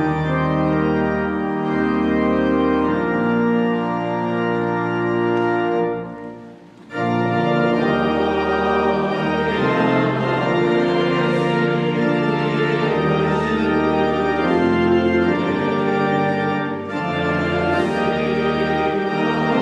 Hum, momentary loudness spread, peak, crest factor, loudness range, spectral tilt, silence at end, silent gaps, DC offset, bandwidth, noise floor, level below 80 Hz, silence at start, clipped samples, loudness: none; 4 LU; -4 dBFS; 14 dB; 2 LU; -7.5 dB/octave; 0 s; none; under 0.1%; 9.8 kHz; -40 dBFS; -46 dBFS; 0 s; under 0.1%; -19 LUFS